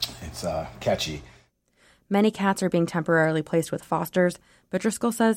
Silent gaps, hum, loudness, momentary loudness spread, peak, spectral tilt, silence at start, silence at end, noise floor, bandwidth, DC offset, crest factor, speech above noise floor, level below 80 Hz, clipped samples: none; none; -25 LUFS; 9 LU; -10 dBFS; -5 dB/octave; 0 s; 0 s; -62 dBFS; 16.5 kHz; under 0.1%; 16 dB; 38 dB; -52 dBFS; under 0.1%